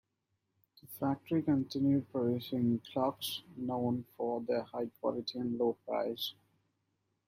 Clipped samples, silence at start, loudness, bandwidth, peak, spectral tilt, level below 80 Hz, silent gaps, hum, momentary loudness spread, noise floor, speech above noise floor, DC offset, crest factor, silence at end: under 0.1%; 0.85 s; -35 LUFS; 16 kHz; -20 dBFS; -6.5 dB/octave; -74 dBFS; none; none; 8 LU; -83 dBFS; 49 dB; under 0.1%; 16 dB; 0.95 s